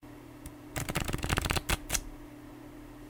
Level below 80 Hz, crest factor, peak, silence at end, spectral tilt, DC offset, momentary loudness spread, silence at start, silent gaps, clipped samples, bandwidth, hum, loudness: -42 dBFS; 28 dB; -8 dBFS; 0 s; -3.5 dB/octave; under 0.1%; 18 LU; 0 s; none; under 0.1%; 19 kHz; none; -33 LUFS